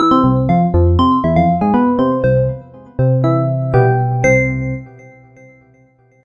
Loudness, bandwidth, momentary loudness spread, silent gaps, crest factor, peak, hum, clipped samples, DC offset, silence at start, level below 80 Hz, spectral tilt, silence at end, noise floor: -14 LUFS; 7 kHz; 9 LU; none; 14 dB; 0 dBFS; none; under 0.1%; under 0.1%; 0 s; -34 dBFS; -8 dB/octave; 1.35 s; -51 dBFS